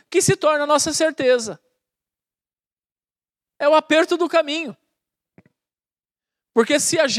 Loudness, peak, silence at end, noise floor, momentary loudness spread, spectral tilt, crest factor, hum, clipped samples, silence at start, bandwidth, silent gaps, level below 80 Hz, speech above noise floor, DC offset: -18 LUFS; -2 dBFS; 0 s; under -90 dBFS; 8 LU; -3 dB/octave; 18 dB; none; under 0.1%; 0.1 s; 14.5 kHz; 2.73-2.77 s, 2.92-2.96 s; -64 dBFS; over 72 dB; under 0.1%